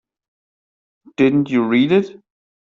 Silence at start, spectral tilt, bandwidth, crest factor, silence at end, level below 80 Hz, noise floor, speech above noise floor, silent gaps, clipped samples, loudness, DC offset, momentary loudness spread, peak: 1.2 s; -7.5 dB/octave; 7.2 kHz; 16 dB; 0.5 s; -62 dBFS; under -90 dBFS; over 74 dB; none; under 0.1%; -16 LUFS; under 0.1%; 14 LU; -2 dBFS